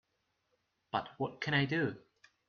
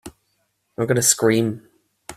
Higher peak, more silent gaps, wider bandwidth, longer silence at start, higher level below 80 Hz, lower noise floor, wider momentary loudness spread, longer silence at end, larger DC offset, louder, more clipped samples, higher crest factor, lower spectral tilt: second, -18 dBFS vs -2 dBFS; neither; second, 6.8 kHz vs 16 kHz; first, 0.95 s vs 0.05 s; second, -72 dBFS vs -58 dBFS; first, -81 dBFS vs -70 dBFS; second, 9 LU vs 21 LU; first, 0.5 s vs 0.05 s; neither; second, -35 LUFS vs -18 LUFS; neither; about the same, 20 dB vs 22 dB; about the same, -4 dB/octave vs -3.5 dB/octave